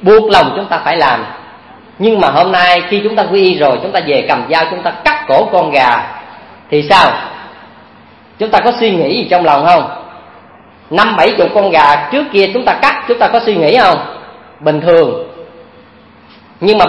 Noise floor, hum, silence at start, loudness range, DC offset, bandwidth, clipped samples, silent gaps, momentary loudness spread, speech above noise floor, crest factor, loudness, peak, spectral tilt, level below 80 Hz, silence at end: -40 dBFS; none; 0 s; 3 LU; under 0.1%; 11 kHz; 0.5%; none; 11 LU; 31 dB; 12 dB; -10 LUFS; 0 dBFS; -5.5 dB/octave; -46 dBFS; 0 s